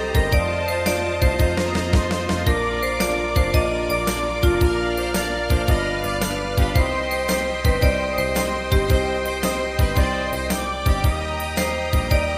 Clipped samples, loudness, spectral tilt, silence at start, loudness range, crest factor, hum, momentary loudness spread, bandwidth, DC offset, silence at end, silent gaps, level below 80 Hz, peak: under 0.1%; -21 LUFS; -5 dB/octave; 0 s; 1 LU; 16 dB; none; 4 LU; 15.5 kHz; under 0.1%; 0 s; none; -26 dBFS; -4 dBFS